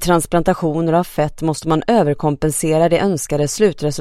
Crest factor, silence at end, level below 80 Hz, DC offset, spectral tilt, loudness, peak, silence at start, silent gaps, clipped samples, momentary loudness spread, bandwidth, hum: 16 dB; 0 s; -38 dBFS; under 0.1%; -5.5 dB/octave; -17 LUFS; 0 dBFS; 0 s; none; under 0.1%; 5 LU; 16 kHz; none